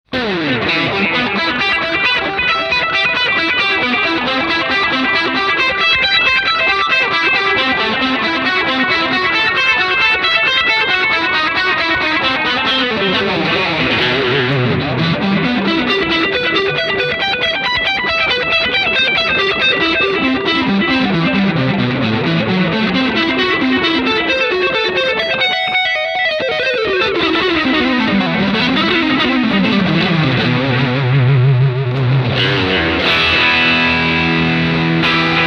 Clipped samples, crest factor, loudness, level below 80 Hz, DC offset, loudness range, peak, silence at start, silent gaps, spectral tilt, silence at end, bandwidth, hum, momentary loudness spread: under 0.1%; 14 dB; -13 LUFS; -42 dBFS; under 0.1%; 2 LU; 0 dBFS; 0.1 s; none; -5.5 dB/octave; 0 s; 9 kHz; none; 4 LU